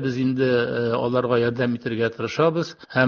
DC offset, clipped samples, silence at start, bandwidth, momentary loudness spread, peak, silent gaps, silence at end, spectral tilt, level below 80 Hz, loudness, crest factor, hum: under 0.1%; under 0.1%; 0 s; 7 kHz; 4 LU; -4 dBFS; none; 0 s; -7 dB/octave; -58 dBFS; -22 LUFS; 18 dB; none